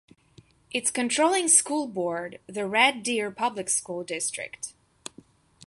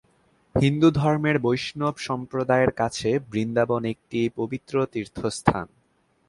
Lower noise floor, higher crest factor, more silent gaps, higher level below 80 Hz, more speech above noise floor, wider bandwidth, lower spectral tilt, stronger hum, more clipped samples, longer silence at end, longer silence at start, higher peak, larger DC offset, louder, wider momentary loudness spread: second, -57 dBFS vs -66 dBFS; about the same, 22 dB vs 24 dB; neither; second, -70 dBFS vs -50 dBFS; second, 31 dB vs 42 dB; about the same, 12 kHz vs 11.5 kHz; second, -1 dB/octave vs -6.5 dB/octave; neither; neither; first, 0.95 s vs 0.6 s; first, 0.7 s vs 0.55 s; second, -6 dBFS vs 0 dBFS; neither; about the same, -25 LUFS vs -24 LUFS; first, 19 LU vs 10 LU